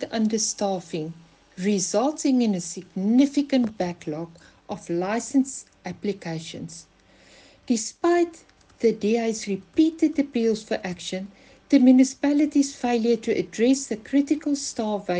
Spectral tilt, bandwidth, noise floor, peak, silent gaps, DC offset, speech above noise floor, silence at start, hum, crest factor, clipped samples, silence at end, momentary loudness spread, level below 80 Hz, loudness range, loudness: -4.5 dB/octave; 9.8 kHz; -54 dBFS; -6 dBFS; none; under 0.1%; 31 dB; 0 s; none; 18 dB; under 0.1%; 0 s; 13 LU; -62 dBFS; 7 LU; -24 LUFS